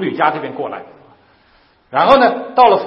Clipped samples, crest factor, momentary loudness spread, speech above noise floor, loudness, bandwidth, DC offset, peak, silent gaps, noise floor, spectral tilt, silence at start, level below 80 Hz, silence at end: under 0.1%; 16 dB; 15 LU; 39 dB; -14 LUFS; 6.2 kHz; under 0.1%; 0 dBFS; none; -53 dBFS; -6.5 dB/octave; 0 s; -50 dBFS; 0 s